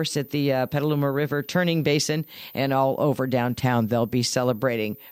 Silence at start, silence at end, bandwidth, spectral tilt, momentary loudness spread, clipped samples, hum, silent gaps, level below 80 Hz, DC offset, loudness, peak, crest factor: 0 s; 0 s; 16.5 kHz; -5.5 dB/octave; 4 LU; under 0.1%; none; none; -60 dBFS; under 0.1%; -24 LUFS; -8 dBFS; 16 dB